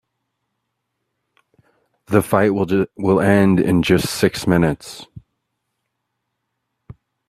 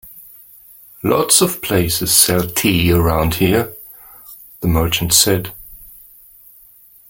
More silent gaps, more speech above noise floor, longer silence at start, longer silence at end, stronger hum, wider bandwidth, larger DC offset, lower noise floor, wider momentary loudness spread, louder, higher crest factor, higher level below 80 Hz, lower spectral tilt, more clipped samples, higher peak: neither; first, 59 dB vs 31 dB; first, 2.1 s vs 0.05 s; second, 0.35 s vs 1.25 s; neither; second, 15 kHz vs 17 kHz; neither; first, -76 dBFS vs -46 dBFS; second, 7 LU vs 24 LU; second, -17 LUFS vs -14 LUFS; about the same, 20 dB vs 18 dB; second, -48 dBFS vs -36 dBFS; first, -6 dB/octave vs -3.5 dB/octave; neither; about the same, 0 dBFS vs 0 dBFS